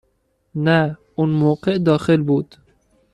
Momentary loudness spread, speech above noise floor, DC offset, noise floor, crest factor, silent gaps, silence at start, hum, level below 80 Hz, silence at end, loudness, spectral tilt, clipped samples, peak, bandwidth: 7 LU; 49 dB; under 0.1%; -66 dBFS; 16 dB; none; 0.55 s; none; -54 dBFS; 0.7 s; -18 LUFS; -8 dB/octave; under 0.1%; -4 dBFS; 9.8 kHz